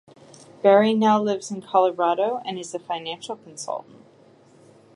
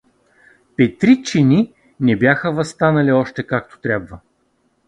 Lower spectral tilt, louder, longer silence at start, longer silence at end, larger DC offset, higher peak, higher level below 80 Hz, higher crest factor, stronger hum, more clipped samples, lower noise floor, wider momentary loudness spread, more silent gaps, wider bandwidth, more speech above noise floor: second, -5 dB/octave vs -7 dB/octave; second, -22 LUFS vs -17 LUFS; second, 0.65 s vs 0.8 s; first, 1.15 s vs 0.7 s; neither; second, -4 dBFS vs 0 dBFS; second, -78 dBFS vs -50 dBFS; about the same, 20 dB vs 18 dB; neither; neither; second, -53 dBFS vs -63 dBFS; first, 16 LU vs 9 LU; neither; first, 11.5 kHz vs 10 kHz; second, 31 dB vs 47 dB